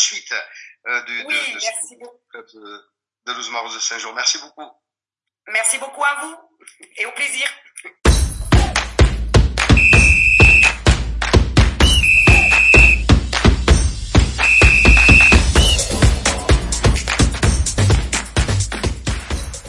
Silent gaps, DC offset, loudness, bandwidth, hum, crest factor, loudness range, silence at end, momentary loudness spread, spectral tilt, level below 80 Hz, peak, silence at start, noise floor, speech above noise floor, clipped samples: none; under 0.1%; -13 LUFS; 11.5 kHz; none; 14 dB; 14 LU; 0 s; 16 LU; -3.5 dB/octave; -20 dBFS; 0 dBFS; 0 s; -85 dBFS; 62 dB; under 0.1%